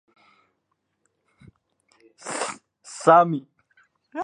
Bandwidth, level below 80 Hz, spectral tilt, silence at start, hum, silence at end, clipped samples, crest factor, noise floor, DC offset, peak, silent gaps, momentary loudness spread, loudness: 11 kHz; -76 dBFS; -5 dB/octave; 2.25 s; none; 0 s; under 0.1%; 24 dB; -75 dBFS; under 0.1%; -2 dBFS; none; 24 LU; -21 LUFS